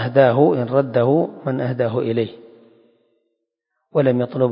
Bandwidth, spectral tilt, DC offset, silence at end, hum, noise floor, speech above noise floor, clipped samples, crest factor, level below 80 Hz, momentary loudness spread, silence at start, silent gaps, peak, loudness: 5.4 kHz; -12.5 dB/octave; under 0.1%; 0 s; none; -76 dBFS; 59 dB; under 0.1%; 18 dB; -64 dBFS; 9 LU; 0 s; none; -2 dBFS; -19 LUFS